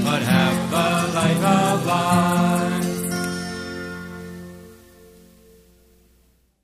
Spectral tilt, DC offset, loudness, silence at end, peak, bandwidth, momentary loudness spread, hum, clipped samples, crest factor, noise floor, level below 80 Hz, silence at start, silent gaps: -5 dB/octave; under 0.1%; -20 LUFS; 1.85 s; -4 dBFS; 15.5 kHz; 17 LU; none; under 0.1%; 18 dB; -60 dBFS; -54 dBFS; 0 s; none